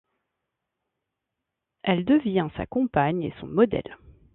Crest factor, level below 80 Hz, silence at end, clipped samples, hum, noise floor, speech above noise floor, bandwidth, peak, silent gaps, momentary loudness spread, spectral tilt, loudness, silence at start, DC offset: 20 dB; -52 dBFS; 0.4 s; under 0.1%; none; -84 dBFS; 60 dB; 4.1 kHz; -6 dBFS; none; 10 LU; -11 dB/octave; -25 LUFS; 1.85 s; under 0.1%